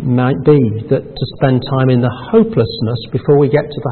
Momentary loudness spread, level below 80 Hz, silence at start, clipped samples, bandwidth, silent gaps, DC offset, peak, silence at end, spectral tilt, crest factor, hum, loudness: 7 LU; -42 dBFS; 0 s; under 0.1%; 4.4 kHz; none; under 0.1%; 0 dBFS; 0 s; -13.5 dB/octave; 12 dB; none; -14 LUFS